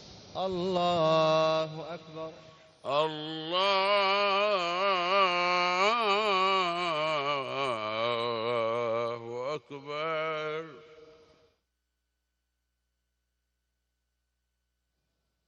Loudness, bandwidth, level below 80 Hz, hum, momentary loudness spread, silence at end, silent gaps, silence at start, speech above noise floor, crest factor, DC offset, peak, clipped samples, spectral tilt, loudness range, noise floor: -28 LUFS; 9.4 kHz; -72 dBFS; 60 Hz at -65 dBFS; 14 LU; 4.4 s; none; 0 s; 53 dB; 18 dB; under 0.1%; -12 dBFS; under 0.1%; -4.5 dB/octave; 12 LU; -82 dBFS